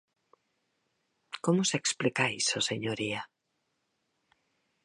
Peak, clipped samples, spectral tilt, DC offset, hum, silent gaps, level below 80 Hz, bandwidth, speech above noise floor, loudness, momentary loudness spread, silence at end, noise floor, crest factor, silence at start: -12 dBFS; under 0.1%; -3 dB/octave; under 0.1%; none; none; -72 dBFS; 11.5 kHz; 50 dB; -30 LUFS; 11 LU; 1.6 s; -80 dBFS; 22 dB; 1.35 s